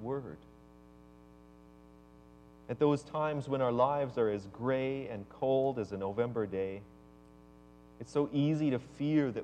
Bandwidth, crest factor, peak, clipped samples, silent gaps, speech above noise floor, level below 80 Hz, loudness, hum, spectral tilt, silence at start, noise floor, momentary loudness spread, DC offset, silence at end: 9.2 kHz; 18 dB; -16 dBFS; under 0.1%; none; 25 dB; -64 dBFS; -33 LUFS; none; -8 dB/octave; 0 s; -57 dBFS; 12 LU; under 0.1%; 0 s